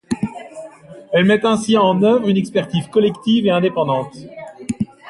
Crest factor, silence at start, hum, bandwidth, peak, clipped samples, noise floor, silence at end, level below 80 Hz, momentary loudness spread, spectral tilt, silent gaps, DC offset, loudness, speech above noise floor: 16 dB; 0.1 s; none; 11.5 kHz; -2 dBFS; under 0.1%; -38 dBFS; 0 s; -54 dBFS; 20 LU; -6 dB/octave; none; under 0.1%; -17 LUFS; 23 dB